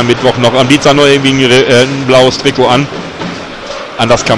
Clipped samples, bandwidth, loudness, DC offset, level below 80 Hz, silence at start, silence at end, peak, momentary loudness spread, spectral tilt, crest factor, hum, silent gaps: 2%; 13.5 kHz; -7 LUFS; under 0.1%; -38 dBFS; 0 s; 0 s; 0 dBFS; 14 LU; -4.5 dB/octave; 8 dB; none; none